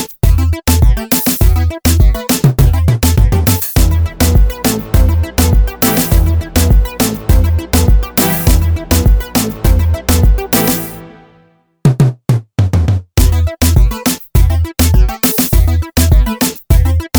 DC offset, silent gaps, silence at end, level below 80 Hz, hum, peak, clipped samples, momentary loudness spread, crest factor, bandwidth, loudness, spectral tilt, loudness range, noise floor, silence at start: under 0.1%; none; 0 s; -14 dBFS; none; 0 dBFS; under 0.1%; 3 LU; 10 dB; over 20 kHz; -12 LUFS; -5 dB/octave; 2 LU; -50 dBFS; 0 s